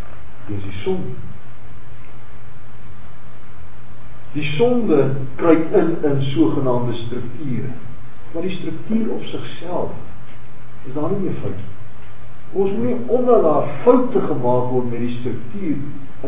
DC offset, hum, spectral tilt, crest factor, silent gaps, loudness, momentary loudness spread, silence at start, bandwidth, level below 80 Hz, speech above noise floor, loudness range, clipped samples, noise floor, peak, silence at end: 10%; none; -11 dB/octave; 22 dB; none; -20 LUFS; 23 LU; 0 s; 3.8 kHz; -48 dBFS; 23 dB; 13 LU; under 0.1%; -42 dBFS; 0 dBFS; 0 s